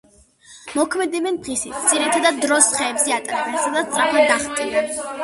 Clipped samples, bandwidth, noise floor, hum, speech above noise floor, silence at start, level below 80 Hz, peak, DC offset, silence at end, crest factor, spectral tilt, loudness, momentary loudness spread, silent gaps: under 0.1%; 12 kHz; -49 dBFS; none; 30 dB; 0.5 s; -58 dBFS; 0 dBFS; under 0.1%; 0 s; 20 dB; -1 dB/octave; -18 LUFS; 8 LU; none